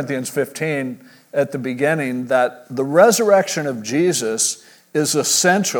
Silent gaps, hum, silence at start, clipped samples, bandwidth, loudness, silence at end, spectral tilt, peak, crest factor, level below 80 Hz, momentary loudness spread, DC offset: none; none; 0 s; under 0.1%; over 20 kHz; -18 LUFS; 0 s; -3.5 dB/octave; 0 dBFS; 18 dB; -74 dBFS; 12 LU; under 0.1%